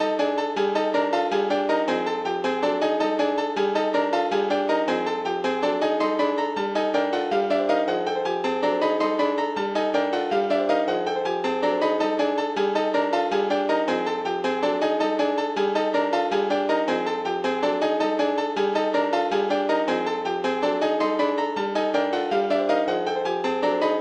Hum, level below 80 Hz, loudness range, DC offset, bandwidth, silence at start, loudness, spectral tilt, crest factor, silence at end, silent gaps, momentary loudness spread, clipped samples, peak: none; -68 dBFS; 0 LU; under 0.1%; 9.2 kHz; 0 s; -23 LUFS; -5 dB/octave; 14 dB; 0 s; none; 3 LU; under 0.1%; -10 dBFS